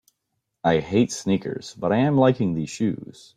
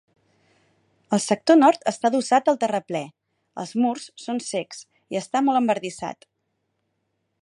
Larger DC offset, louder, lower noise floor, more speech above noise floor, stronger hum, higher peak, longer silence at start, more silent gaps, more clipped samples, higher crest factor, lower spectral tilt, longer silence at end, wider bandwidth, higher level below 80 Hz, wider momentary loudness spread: neither; about the same, -23 LUFS vs -22 LUFS; about the same, -78 dBFS vs -75 dBFS; about the same, 56 dB vs 53 dB; neither; about the same, -6 dBFS vs -4 dBFS; second, 0.65 s vs 1.1 s; neither; neither; about the same, 18 dB vs 20 dB; first, -6.5 dB/octave vs -4.5 dB/octave; second, 0.3 s vs 1.3 s; about the same, 11.5 kHz vs 11.5 kHz; first, -58 dBFS vs -74 dBFS; second, 9 LU vs 18 LU